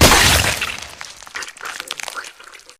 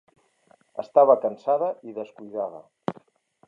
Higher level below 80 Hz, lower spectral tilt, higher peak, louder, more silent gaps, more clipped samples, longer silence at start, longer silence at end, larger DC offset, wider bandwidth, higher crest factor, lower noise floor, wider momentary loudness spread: first, -30 dBFS vs -80 dBFS; second, -2 dB/octave vs -8 dB/octave; first, 0 dBFS vs -4 dBFS; first, -16 LUFS vs -24 LUFS; neither; neither; second, 0 s vs 0.75 s; second, 0.25 s vs 0.55 s; neither; first, 16.5 kHz vs 5.6 kHz; about the same, 18 dB vs 22 dB; second, -42 dBFS vs -61 dBFS; about the same, 21 LU vs 19 LU